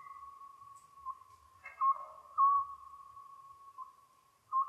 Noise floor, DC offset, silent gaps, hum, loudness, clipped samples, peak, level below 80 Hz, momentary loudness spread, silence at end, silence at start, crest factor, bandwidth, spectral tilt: -67 dBFS; under 0.1%; none; none; -34 LUFS; under 0.1%; -20 dBFS; -78 dBFS; 25 LU; 0 s; 0.05 s; 18 dB; 12.5 kHz; -2.5 dB/octave